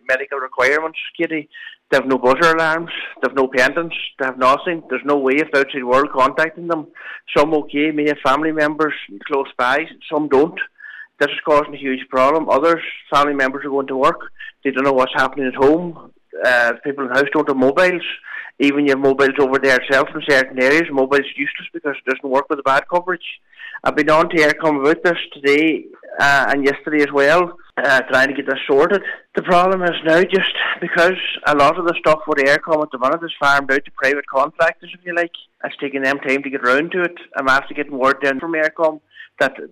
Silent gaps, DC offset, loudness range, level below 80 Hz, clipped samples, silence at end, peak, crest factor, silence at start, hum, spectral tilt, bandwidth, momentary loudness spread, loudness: none; under 0.1%; 3 LU; -52 dBFS; under 0.1%; 0.05 s; -4 dBFS; 12 dB; 0.1 s; none; -4.5 dB/octave; 14 kHz; 10 LU; -17 LUFS